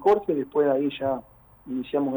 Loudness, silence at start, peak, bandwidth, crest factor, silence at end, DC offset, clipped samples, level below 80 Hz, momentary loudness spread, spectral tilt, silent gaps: -26 LUFS; 0 s; -10 dBFS; over 20 kHz; 14 dB; 0 s; under 0.1%; under 0.1%; -60 dBFS; 11 LU; -8 dB/octave; none